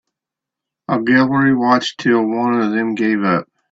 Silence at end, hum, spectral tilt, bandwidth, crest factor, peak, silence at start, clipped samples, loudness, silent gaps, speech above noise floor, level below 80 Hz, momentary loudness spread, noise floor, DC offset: 0.3 s; none; -6 dB/octave; 7.8 kHz; 16 dB; 0 dBFS; 0.9 s; under 0.1%; -16 LUFS; none; 69 dB; -58 dBFS; 7 LU; -84 dBFS; under 0.1%